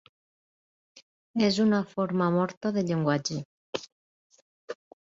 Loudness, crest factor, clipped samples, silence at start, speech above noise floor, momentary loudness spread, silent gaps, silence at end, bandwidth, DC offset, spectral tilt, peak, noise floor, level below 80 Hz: -28 LUFS; 18 dB; under 0.1%; 1.35 s; over 64 dB; 14 LU; 2.57-2.61 s, 3.45-3.73 s, 3.92-4.30 s, 4.42-4.68 s; 0.3 s; 7.8 kHz; under 0.1%; -6 dB/octave; -12 dBFS; under -90 dBFS; -68 dBFS